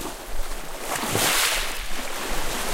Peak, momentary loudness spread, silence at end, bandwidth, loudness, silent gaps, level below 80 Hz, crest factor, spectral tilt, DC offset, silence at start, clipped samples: -8 dBFS; 15 LU; 0 s; 16.5 kHz; -25 LUFS; none; -32 dBFS; 16 dB; -1.5 dB/octave; under 0.1%; 0 s; under 0.1%